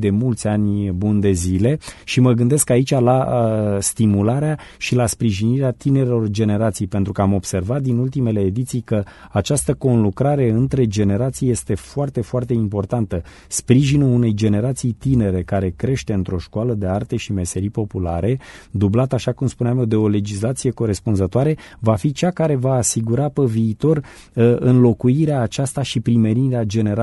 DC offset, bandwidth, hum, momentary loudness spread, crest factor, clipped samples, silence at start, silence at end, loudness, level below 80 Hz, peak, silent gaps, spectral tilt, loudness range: under 0.1%; 12 kHz; none; 7 LU; 16 dB; under 0.1%; 0 s; 0 s; -19 LUFS; -42 dBFS; 0 dBFS; none; -6.5 dB/octave; 4 LU